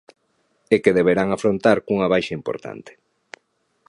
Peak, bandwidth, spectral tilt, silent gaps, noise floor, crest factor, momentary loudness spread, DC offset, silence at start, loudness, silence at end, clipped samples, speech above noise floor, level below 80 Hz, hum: -2 dBFS; 11 kHz; -6.5 dB/octave; none; -67 dBFS; 20 dB; 14 LU; under 0.1%; 0.7 s; -19 LUFS; 1 s; under 0.1%; 48 dB; -56 dBFS; none